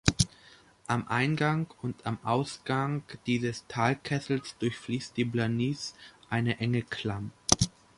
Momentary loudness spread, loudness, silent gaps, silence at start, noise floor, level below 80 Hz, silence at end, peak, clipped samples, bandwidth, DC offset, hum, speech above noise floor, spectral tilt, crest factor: 8 LU; -31 LUFS; none; 0.05 s; -57 dBFS; -52 dBFS; 0.3 s; 0 dBFS; under 0.1%; 11.5 kHz; under 0.1%; none; 27 dB; -4.5 dB/octave; 30 dB